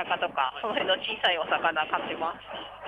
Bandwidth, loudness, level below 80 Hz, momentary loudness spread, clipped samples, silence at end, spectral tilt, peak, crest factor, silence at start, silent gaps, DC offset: 10.5 kHz; -27 LUFS; -64 dBFS; 8 LU; under 0.1%; 0 s; -4.5 dB/octave; -10 dBFS; 18 dB; 0 s; none; under 0.1%